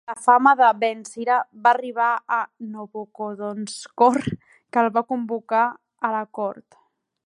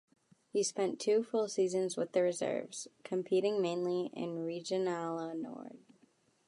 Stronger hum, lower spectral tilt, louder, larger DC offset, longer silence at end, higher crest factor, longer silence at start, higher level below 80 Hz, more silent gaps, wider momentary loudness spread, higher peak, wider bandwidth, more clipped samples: neither; about the same, -5 dB/octave vs -4.5 dB/octave; first, -21 LUFS vs -35 LUFS; neither; about the same, 0.65 s vs 0.7 s; about the same, 20 dB vs 16 dB; second, 0.1 s vs 0.55 s; first, -62 dBFS vs -88 dBFS; neither; first, 16 LU vs 10 LU; first, -2 dBFS vs -18 dBFS; about the same, 11.5 kHz vs 11.5 kHz; neither